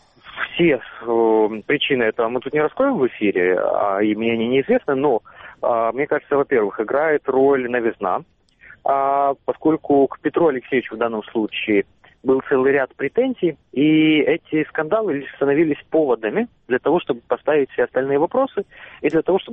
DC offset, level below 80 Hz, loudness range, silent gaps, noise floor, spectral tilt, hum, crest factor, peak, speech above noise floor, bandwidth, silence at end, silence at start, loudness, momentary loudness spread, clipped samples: under 0.1%; -58 dBFS; 2 LU; none; -48 dBFS; -4 dB/octave; none; 14 dB; -4 dBFS; 29 dB; 3.9 kHz; 0 s; 0.25 s; -19 LUFS; 7 LU; under 0.1%